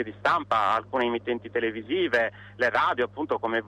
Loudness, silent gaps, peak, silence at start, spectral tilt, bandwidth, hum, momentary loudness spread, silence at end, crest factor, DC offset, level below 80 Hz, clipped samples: -26 LUFS; none; -12 dBFS; 0 s; -5.5 dB/octave; 10.5 kHz; 50 Hz at -50 dBFS; 6 LU; 0 s; 14 dB; under 0.1%; -62 dBFS; under 0.1%